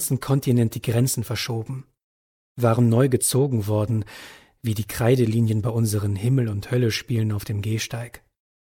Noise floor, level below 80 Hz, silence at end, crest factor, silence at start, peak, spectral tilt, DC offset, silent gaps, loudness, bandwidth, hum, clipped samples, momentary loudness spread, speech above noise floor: under -90 dBFS; -52 dBFS; 0.55 s; 16 dB; 0 s; -6 dBFS; -6 dB/octave; under 0.1%; 2.04-2.55 s; -22 LUFS; 18 kHz; none; under 0.1%; 11 LU; over 68 dB